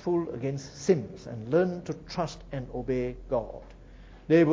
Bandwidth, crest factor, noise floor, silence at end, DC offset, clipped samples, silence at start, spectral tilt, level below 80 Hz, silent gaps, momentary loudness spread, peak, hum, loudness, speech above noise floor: 7.8 kHz; 20 dB; -49 dBFS; 0 s; under 0.1%; under 0.1%; 0 s; -7 dB/octave; -50 dBFS; none; 13 LU; -10 dBFS; none; -30 LUFS; 19 dB